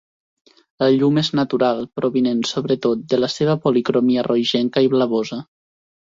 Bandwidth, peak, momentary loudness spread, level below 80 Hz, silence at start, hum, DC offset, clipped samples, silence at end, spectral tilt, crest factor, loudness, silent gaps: 7.8 kHz; -4 dBFS; 5 LU; -60 dBFS; 0.8 s; none; under 0.1%; under 0.1%; 0.7 s; -6 dB/octave; 16 dB; -19 LUFS; none